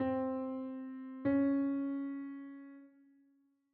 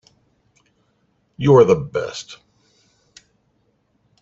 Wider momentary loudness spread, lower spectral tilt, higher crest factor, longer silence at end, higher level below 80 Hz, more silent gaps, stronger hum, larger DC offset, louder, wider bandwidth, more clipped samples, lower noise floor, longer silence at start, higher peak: about the same, 19 LU vs 20 LU; about the same, -7.5 dB/octave vs -7 dB/octave; about the same, 16 dB vs 20 dB; second, 0.85 s vs 1.85 s; second, -76 dBFS vs -54 dBFS; neither; neither; neither; second, -37 LUFS vs -16 LUFS; second, 3.9 kHz vs 7.8 kHz; neither; first, -73 dBFS vs -65 dBFS; second, 0 s vs 1.4 s; second, -22 dBFS vs -2 dBFS